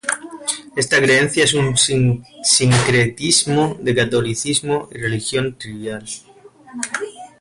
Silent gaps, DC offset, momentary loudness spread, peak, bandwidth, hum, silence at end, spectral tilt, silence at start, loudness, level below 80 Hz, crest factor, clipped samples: none; under 0.1%; 15 LU; -2 dBFS; 11.5 kHz; none; 0.15 s; -3.5 dB/octave; 0.05 s; -17 LUFS; -48 dBFS; 16 dB; under 0.1%